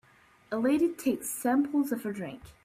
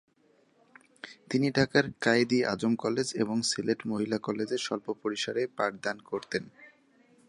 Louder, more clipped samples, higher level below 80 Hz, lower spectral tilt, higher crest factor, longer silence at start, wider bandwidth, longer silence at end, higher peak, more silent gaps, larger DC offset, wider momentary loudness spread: about the same, -29 LUFS vs -30 LUFS; neither; about the same, -66 dBFS vs -68 dBFS; about the same, -5 dB/octave vs -4.5 dB/octave; second, 14 dB vs 22 dB; second, 0.5 s vs 1.05 s; first, 16 kHz vs 11.5 kHz; second, 0.15 s vs 0.6 s; second, -16 dBFS vs -8 dBFS; neither; neither; about the same, 10 LU vs 10 LU